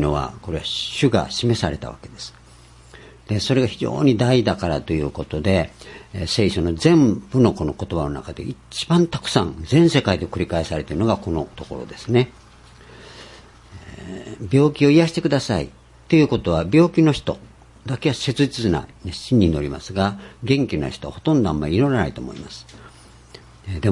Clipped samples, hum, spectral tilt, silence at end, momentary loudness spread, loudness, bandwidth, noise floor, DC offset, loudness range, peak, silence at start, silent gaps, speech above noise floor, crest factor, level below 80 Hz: under 0.1%; none; -6.5 dB/octave; 0 s; 18 LU; -20 LUFS; 11.5 kHz; -46 dBFS; under 0.1%; 5 LU; -2 dBFS; 0 s; none; 27 dB; 20 dB; -42 dBFS